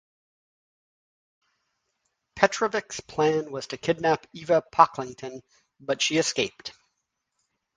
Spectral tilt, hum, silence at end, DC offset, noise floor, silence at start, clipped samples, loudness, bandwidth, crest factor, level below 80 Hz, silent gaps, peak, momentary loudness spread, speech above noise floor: -3.5 dB/octave; none; 1.05 s; under 0.1%; -80 dBFS; 2.35 s; under 0.1%; -25 LUFS; 10 kHz; 28 dB; -64 dBFS; none; 0 dBFS; 19 LU; 54 dB